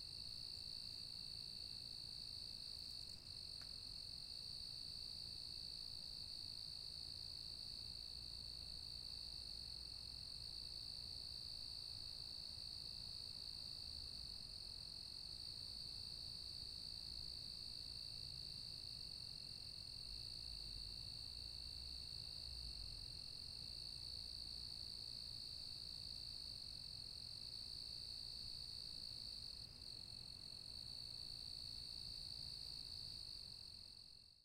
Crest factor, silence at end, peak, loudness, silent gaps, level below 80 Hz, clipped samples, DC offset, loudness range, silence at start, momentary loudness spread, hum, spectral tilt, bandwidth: 14 dB; 0 s; -38 dBFS; -49 LUFS; none; -66 dBFS; under 0.1%; under 0.1%; 1 LU; 0 s; 2 LU; none; -2 dB/octave; 16 kHz